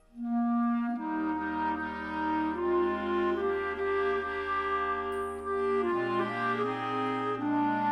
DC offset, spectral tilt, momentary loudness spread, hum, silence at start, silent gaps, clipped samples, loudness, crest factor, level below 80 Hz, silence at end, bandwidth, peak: under 0.1%; -7 dB/octave; 4 LU; none; 0.15 s; none; under 0.1%; -31 LUFS; 12 dB; -58 dBFS; 0 s; 12 kHz; -18 dBFS